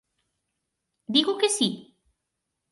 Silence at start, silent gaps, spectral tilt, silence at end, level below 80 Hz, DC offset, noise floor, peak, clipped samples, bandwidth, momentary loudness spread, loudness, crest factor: 1.1 s; none; -2.5 dB/octave; 0.9 s; -76 dBFS; under 0.1%; -82 dBFS; -6 dBFS; under 0.1%; 11.5 kHz; 6 LU; -24 LUFS; 24 dB